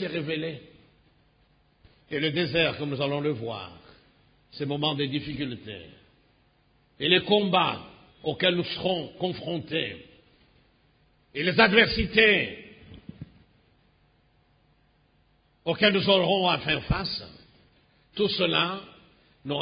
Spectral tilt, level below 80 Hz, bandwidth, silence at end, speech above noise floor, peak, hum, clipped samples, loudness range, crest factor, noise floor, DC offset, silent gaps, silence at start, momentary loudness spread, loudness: -9 dB/octave; -50 dBFS; 5.2 kHz; 0 s; 39 dB; -4 dBFS; none; under 0.1%; 7 LU; 24 dB; -65 dBFS; under 0.1%; none; 0 s; 21 LU; -25 LUFS